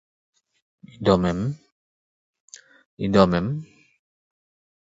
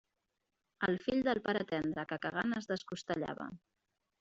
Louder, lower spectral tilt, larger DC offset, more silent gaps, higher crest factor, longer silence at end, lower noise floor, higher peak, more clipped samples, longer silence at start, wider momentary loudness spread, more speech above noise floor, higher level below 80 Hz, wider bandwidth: first, -22 LUFS vs -37 LUFS; first, -7 dB/octave vs -4 dB/octave; neither; first, 1.72-2.33 s, 2.40-2.48 s, 2.86-2.97 s vs none; about the same, 22 dB vs 20 dB; first, 1.2 s vs 0.65 s; first, under -90 dBFS vs -86 dBFS; first, -4 dBFS vs -18 dBFS; neither; first, 1 s vs 0.8 s; first, 13 LU vs 7 LU; first, over 70 dB vs 50 dB; first, -48 dBFS vs -70 dBFS; about the same, 7.8 kHz vs 8 kHz